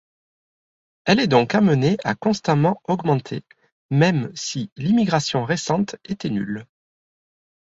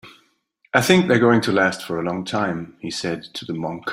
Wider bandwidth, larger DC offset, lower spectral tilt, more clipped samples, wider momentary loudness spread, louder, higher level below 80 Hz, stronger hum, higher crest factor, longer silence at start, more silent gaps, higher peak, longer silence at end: second, 8 kHz vs 16 kHz; neither; about the same, -6 dB/octave vs -5 dB/octave; neither; about the same, 11 LU vs 13 LU; about the same, -21 LUFS vs -20 LUFS; about the same, -58 dBFS vs -58 dBFS; neither; about the same, 18 dB vs 20 dB; first, 1.05 s vs 0.05 s; first, 3.72-3.89 s, 4.72-4.76 s vs none; about the same, -2 dBFS vs 0 dBFS; first, 1.1 s vs 0 s